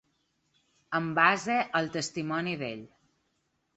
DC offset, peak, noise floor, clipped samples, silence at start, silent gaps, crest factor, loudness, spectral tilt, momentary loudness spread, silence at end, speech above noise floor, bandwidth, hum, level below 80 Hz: under 0.1%; -6 dBFS; -76 dBFS; under 0.1%; 0.9 s; none; 26 dB; -29 LUFS; -4.5 dB/octave; 12 LU; 0.9 s; 47 dB; 8.4 kHz; none; -72 dBFS